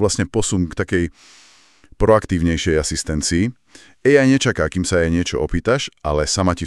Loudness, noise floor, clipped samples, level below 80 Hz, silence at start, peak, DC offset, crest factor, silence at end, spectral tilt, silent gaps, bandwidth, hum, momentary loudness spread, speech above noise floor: -18 LUFS; -50 dBFS; under 0.1%; -34 dBFS; 0 s; 0 dBFS; under 0.1%; 18 dB; 0 s; -5 dB/octave; none; 12.5 kHz; none; 6 LU; 32 dB